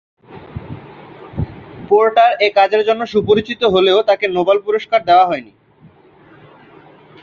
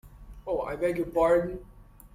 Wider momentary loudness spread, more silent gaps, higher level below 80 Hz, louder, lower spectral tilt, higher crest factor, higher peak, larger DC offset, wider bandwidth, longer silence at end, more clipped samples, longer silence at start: first, 20 LU vs 17 LU; neither; about the same, -44 dBFS vs -48 dBFS; first, -14 LUFS vs -28 LUFS; about the same, -6.5 dB/octave vs -7 dB/octave; about the same, 14 dB vs 16 dB; first, -2 dBFS vs -12 dBFS; neither; second, 7 kHz vs 15.5 kHz; first, 1.8 s vs 0.05 s; neither; first, 0.3 s vs 0.05 s